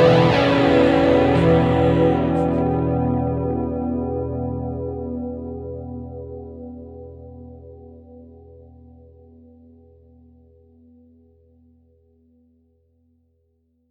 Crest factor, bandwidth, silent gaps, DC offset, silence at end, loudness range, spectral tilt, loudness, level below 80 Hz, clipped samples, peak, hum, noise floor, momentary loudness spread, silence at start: 20 dB; 8.6 kHz; none; under 0.1%; 5.65 s; 24 LU; -8 dB/octave; -19 LUFS; -40 dBFS; under 0.1%; -2 dBFS; none; -66 dBFS; 23 LU; 0 s